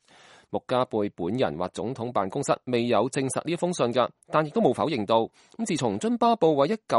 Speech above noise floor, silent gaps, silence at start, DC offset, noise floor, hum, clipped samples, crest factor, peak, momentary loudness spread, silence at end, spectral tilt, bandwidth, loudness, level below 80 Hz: 29 dB; none; 0.5 s; under 0.1%; -54 dBFS; none; under 0.1%; 18 dB; -8 dBFS; 9 LU; 0 s; -5.5 dB/octave; 11.5 kHz; -26 LUFS; -66 dBFS